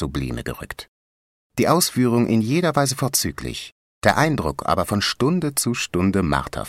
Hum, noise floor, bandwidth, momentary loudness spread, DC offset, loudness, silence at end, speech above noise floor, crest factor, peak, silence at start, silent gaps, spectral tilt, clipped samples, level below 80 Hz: none; under -90 dBFS; 16 kHz; 13 LU; under 0.1%; -21 LUFS; 0 s; over 69 dB; 20 dB; -2 dBFS; 0 s; 0.88-1.50 s, 3.72-4.01 s; -4.5 dB/octave; under 0.1%; -42 dBFS